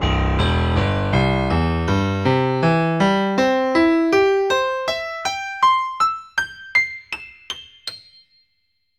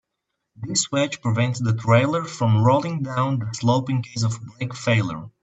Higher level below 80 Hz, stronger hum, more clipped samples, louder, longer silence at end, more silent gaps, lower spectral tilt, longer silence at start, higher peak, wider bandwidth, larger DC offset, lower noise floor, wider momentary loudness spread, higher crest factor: first, -32 dBFS vs -60 dBFS; neither; neither; first, -19 LUFS vs -22 LUFS; first, 1 s vs 0.15 s; neither; about the same, -6 dB/octave vs -5.5 dB/octave; second, 0 s vs 0.6 s; about the same, -4 dBFS vs -4 dBFS; first, 13.5 kHz vs 8.4 kHz; neither; second, -70 dBFS vs -79 dBFS; first, 14 LU vs 8 LU; about the same, 14 dB vs 18 dB